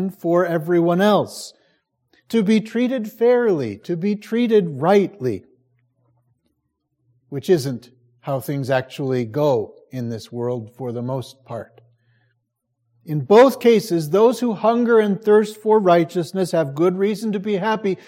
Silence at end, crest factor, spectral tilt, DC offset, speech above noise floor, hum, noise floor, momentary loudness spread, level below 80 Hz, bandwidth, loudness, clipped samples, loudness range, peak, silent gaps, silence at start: 0.1 s; 18 dB; -6.5 dB/octave; under 0.1%; 55 dB; none; -73 dBFS; 14 LU; -70 dBFS; 16.5 kHz; -19 LUFS; under 0.1%; 10 LU; -2 dBFS; none; 0 s